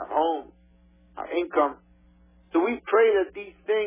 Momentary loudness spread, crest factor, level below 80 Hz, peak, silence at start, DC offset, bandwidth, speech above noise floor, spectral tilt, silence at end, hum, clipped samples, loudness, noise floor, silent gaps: 13 LU; 16 dB; -60 dBFS; -10 dBFS; 0 s; under 0.1%; 3.7 kHz; 33 dB; -8 dB/octave; 0 s; none; under 0.1%; -25 LUFS; -57 dBFS; none